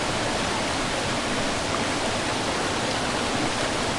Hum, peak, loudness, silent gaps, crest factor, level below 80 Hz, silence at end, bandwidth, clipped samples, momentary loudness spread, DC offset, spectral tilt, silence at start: none; -12 dBFS; -25 LUFS; none; 12 dB; -42 dBFS; 0 s; 11.5 kHz; under 0.1%; 1 LU; under 0.1%; -3 dB/octave; 0 s